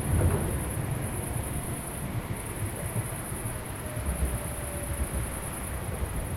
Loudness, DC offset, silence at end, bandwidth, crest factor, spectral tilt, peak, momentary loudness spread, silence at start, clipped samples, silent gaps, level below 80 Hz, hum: -32 LUFS; under 0.1%; 0 s; 16.5 kHz; 16 dB; -5 dB/octave; -14 dBFS; 5 LU; 0 s; under 0.1%; none; -38 dBFS; none